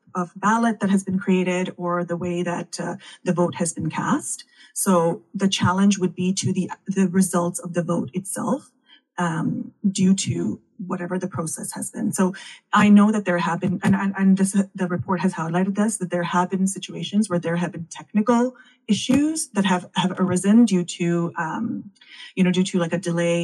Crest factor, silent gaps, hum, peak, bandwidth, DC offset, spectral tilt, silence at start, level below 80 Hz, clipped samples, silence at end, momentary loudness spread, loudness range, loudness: 16 dB; none; none; -6 dBFS; 12.5 kHz; under 0.1%; -5.5 dB/octave; 0.15 s; -64 dBFS; under 0.1%; 0 s; 10 LU; 5 LU; -22 LUFS